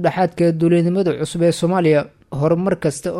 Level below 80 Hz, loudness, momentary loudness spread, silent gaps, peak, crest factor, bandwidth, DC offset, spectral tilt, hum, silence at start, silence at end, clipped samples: -50 dBFS; -17 LUFS; 5 LU; none; -4 dBFS; 12 dB; 12.5 kHz; under 0.1%; -7 dB/octave; none; 0 s; 0 s; under 0.1%